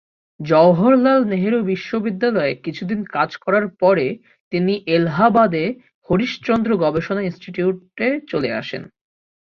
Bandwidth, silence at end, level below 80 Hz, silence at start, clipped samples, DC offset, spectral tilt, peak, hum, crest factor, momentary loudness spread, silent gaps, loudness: 6.8 kHz; 0.7 s; -54 dBFS; 0.4 s; under 0.1%; under 0.1%; -8 dB/octave; -2 dBFS; none; 16 dB; 12 LU; 4.40-4.51 s, 5.94-6.02 s; -18 LUFS